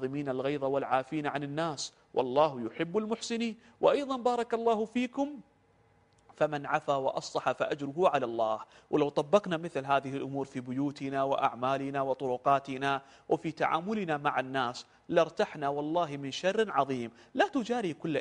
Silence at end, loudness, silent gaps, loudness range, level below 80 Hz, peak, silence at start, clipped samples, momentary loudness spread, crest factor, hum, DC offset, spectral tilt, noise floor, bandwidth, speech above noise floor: 0 s; -31 LUFS; none; 2 LU; -72 dBFS; -10 dBFS; 0 s; under 0.1%; 7 LU; 22 dB; none; under 0.1%; -5.5 dB/octave; -66 dBFS; 10.5 kHz; 35 dB